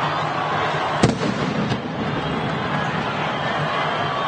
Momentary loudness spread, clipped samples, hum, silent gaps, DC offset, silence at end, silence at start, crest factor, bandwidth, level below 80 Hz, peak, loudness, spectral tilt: 4 LU; under 0.1%; none; none; under 0.1%; 0 s; 0 s; 18 dB; 9.4 kHz; -48 dBFS; -4 dBFS; -22 LUFS; -5.5 dB/octave